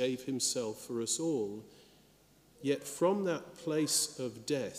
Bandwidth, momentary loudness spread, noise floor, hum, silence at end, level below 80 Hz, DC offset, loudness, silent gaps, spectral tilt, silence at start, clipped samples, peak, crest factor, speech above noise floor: 15.5 kHz; 9 LU; -64 dBFS; none; 0 s; -74 dBFS; under 0.1%; -34 LUFS; none; -3.5 dB/octave; 0 s; under 0.1%; -18 dBFS; 18 dB; 30 dB